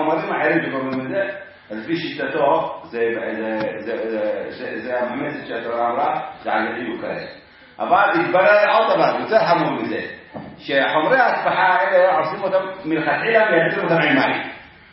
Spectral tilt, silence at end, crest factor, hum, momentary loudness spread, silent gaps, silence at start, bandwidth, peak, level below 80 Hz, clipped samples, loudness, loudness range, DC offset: -9.5 dB/octave; 0.25 s; 18 dB; none; 13 LU; none; 0 s; 5.8 kHz; -2 dBFS; -62 dBFS; under 0.1%; -19 LUFS; 7 LU; under 0.1%